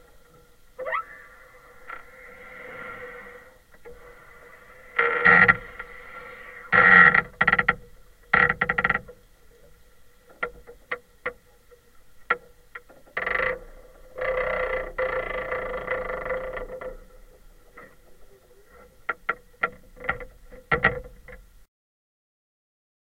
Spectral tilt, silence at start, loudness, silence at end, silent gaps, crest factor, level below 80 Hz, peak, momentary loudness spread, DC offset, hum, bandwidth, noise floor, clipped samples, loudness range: -5.5 dB/octave; 0.8 s; -22 LUFS; 1.75 s; none; 26 dB; -48 dBFS; 0 dBFS; 25 LU; under 0.1%; none; 16 kHz; -55 dBFS; under 0.1%; 19 LU